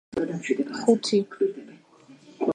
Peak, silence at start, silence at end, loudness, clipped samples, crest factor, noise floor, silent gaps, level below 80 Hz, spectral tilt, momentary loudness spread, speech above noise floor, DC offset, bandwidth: -6 dBFS; 0.15 s; 0 s; -25 LUFS; under 0.1%; 20 dB; -53 dBFS; none; -66 dBFS; -5 dB/octave; 8 LU; 28 dB; under 0.1%; 10 kHz